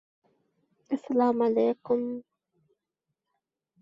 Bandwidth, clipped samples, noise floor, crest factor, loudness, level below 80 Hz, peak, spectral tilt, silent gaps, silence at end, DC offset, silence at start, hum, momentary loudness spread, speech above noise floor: 7.2 kHz; under 0.1%; -85 dBFS; 18 dB; -27 LUFS; -76 dBFS; -12 dBFS; -8 dB/octave; none; 1.6 s; under 0.1%; 0.9 s; none; 11 LU; 59 dB